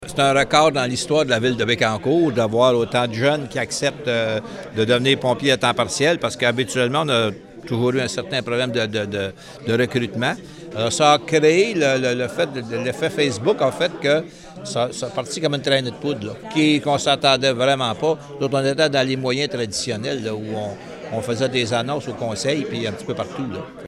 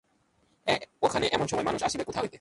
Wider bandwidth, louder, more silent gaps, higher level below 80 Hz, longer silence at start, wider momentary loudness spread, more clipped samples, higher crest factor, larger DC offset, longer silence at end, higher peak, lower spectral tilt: first, 14 kHz vs 11.5 kHz; first, -20 LUFS vs -29 LUFS; neither; about the same, -56 dBFS vs -56 dBFS; second, 0 s vs 0.65 s; first, 11 LU vs 5 LU; neither; about the same, 20 dB vs 20 dB; neither; about the same, 0 s vs 0.05 s; first, -2 dBFS vs -10 dBFS; about the same, -4.5 dB/octave vs -3.5 dB/octave